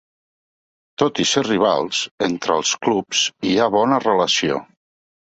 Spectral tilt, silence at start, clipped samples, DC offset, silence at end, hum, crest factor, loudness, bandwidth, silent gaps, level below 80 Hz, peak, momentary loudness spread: -3 dB/octave; 1 s; under 0.1%; under 0.1%; 0.6 s; none; 18 dB; -19 LUFS; 8.2 kHz; 2.11-2.18 s; -60 dBFS; -2 dBFS; 6 LU